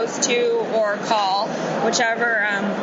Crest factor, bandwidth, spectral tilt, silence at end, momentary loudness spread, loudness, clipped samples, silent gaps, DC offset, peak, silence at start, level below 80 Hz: 14 dB; 8.4 kHz; -2.5 dB/octave; 0 s; 3 LU; -20 LUFS; under 0.1%; none; under 0.1%; -6 dBFS; 0 s; -68 dBFS